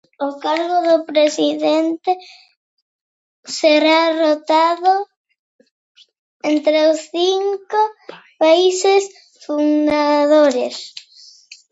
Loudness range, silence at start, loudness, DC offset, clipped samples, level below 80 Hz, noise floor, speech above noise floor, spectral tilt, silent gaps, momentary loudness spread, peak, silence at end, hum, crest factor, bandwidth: 3 LU; 0.2 s; -16 LUFS; under 0.1%; under 0.1%; -66 dBFS; -46 dBFS; 30 dB; -2 dB/octave; 2.56-3.43 s, 5.16-5.25 s, 5.39-5.59 s, 5.71-5.95 s, 6.19-6.40 s; 12 LU; -2 dBFS; 0.7 s; none; 16 dB; 8 kHz